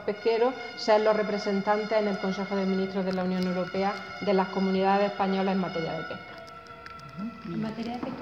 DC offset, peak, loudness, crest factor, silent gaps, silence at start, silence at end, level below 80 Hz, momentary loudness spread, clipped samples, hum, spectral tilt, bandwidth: under 0.1%; -10 dBFS; -28 LUFS; 16 dB; none; 0 s; 0 s; -64 dBFS; 14 LU; under 0.1%; none; -6.5 dB/octave; 7.6 kHz